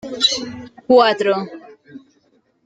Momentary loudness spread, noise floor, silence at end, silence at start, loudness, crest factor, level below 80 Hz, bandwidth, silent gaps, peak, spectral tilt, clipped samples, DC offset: 19 LU; -60 dBFS; 0.65 s; 0.05 s; -16 LUFS; 18 dB; -62 dBFS; 9.4 kHz; none; -2 dBFS; -3 dB/octave; under 0.1%; under 0.1%